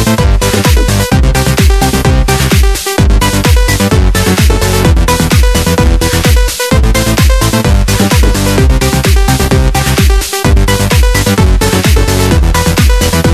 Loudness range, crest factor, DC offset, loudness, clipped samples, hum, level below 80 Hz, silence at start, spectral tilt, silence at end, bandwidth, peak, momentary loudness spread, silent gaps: 0 LU; 8 dB; 0.6%; -9 LUFS; 1%; none; -10 dBFS; 0 s; -4.5 dB/octave; 0 s; 14 kHz; 0 dBFS; 1 LU; none